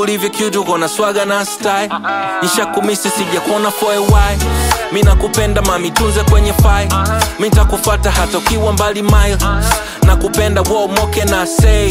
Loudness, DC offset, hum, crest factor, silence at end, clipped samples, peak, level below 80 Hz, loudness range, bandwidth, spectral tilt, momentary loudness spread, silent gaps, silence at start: -13 LUFS; under 0.1%; none; 12 dB; 0 s; under 0.1%; 0 dBFS; -16 dBFS; 2 LU; 16.5 kHz; -4.5 dB/octave; 4 LU; none; 0 s